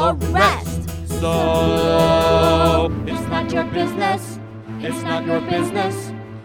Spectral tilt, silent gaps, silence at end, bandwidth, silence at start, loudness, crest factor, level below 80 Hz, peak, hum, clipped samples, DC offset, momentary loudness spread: -5.5 dB/octave; none; 0 s; 18.5 kHz; 0 s; -19 LUFS; 16 dB; -34 dBFS; -2 dBFS; none; under 0.1%; under 0.1%; 12 LU